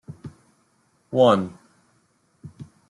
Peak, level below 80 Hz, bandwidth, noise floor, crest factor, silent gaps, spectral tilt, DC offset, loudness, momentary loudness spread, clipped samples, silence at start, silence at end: -4 dBFS; -66 dBFS; 11 kHz; -65 dBFS; 22 dB; none; -7 dB/octave; under 0.1%; -20 LUFS; 26 LU; under 0.1%; 0.1 s; 0.25 s